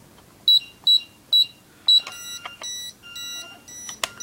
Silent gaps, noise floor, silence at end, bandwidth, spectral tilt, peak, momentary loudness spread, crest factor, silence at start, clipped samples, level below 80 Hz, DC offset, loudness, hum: none; -39 dBFS; 0.15 s; 16.5 kHz; 1.5 dB/octave; -4 dBFS; 18 LU; 20 dB; 0.45 s; under 0.1%; -66 dBFS; under 0.1%; -18 LUFS; none